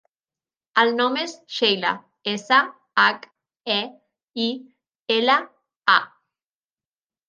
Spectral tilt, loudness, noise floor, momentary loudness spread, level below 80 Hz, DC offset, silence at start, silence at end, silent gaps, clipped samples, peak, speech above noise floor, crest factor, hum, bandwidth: -3 dB/octave; -21 LUFS; under -90 dBFS; 17 LU; -80 dBFS; under 0.1%; 0.75 s; 1.25 s; 4.23-4.28 s, 4.95-5.06 s, 5.76-5.80 s; under 0.1%; -2 dBFS; over 69 dB; 22 dB; none; 9.6 kHz